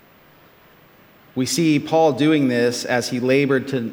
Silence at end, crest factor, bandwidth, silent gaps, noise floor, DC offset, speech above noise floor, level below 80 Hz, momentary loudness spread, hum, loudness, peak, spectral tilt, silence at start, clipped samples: 0 s; 16 dB; 18 kHz; none; -51 dBFS; under 0.1%; 32 dB; -66 dBFS; 6 LU; none; -19 LUFS; -4 dBFS; -5 dB/octave; 1.35 s; under 0.1%